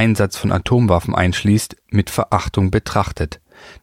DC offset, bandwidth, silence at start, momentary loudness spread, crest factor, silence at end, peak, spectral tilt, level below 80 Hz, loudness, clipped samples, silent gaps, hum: under 0.1%; 16 kHz; 0 s; 7 LU; 16 dB; 0.1 s; -2 dBFS; -6 dB/octave; -34 dBFS; -18 LUFS; under 0.1%; none; none